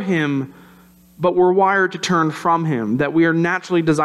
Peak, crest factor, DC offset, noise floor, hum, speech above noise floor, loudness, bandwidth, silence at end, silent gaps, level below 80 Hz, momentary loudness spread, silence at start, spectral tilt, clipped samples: -4 dBFS; 12 dB; under 0.1%; -48 dBFS; none; 31 dB; -18 LUFS; 12.5 kHz; 0 s; none; -58 dBFS; 7 LU; 0 s; -6 dB/octave; under 0.1%